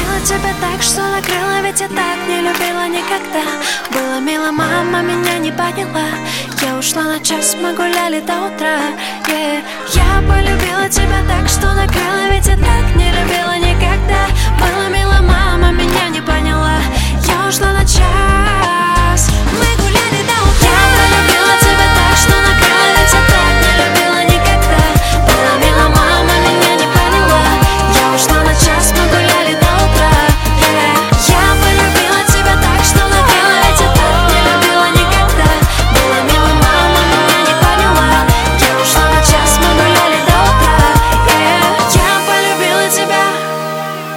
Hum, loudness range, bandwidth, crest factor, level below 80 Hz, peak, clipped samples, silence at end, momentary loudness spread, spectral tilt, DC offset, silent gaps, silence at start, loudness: none; 6 LU; 17.5 kHz; 10 dB; -16 dBFS; 0 dBFS; under 0.1%; 0 s; 8 LU; -3.5 dB/octave; under 0.1%; none; 0 s; -11 LUFS